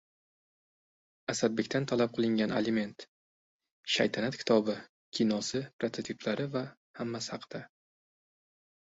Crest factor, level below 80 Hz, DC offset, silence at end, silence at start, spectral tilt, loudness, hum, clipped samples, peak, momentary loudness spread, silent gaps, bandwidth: 22 dB; -72 dBFS; under 0.1%; 1.15 s; 1.3 s; -4.5 dB/octave; -32 LUFS; none; under 0.1%; -12 dBFS; 13 LU; 3.08-3.60 s, 3.72-3.83 s, 4.89-5.12 s, 5.73-5.79 s, 6.77-6.94 s; 8 kHz